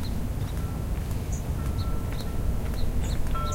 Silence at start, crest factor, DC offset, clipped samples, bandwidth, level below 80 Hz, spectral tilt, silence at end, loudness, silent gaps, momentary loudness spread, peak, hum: 0 s; 12 dB; under 0.1%; under 0.1%; 16.5 kHz; -30 dBFS; -6 dB/octave; 0 s; -31 LUFS; none; 2 LU; -14 dBFS; none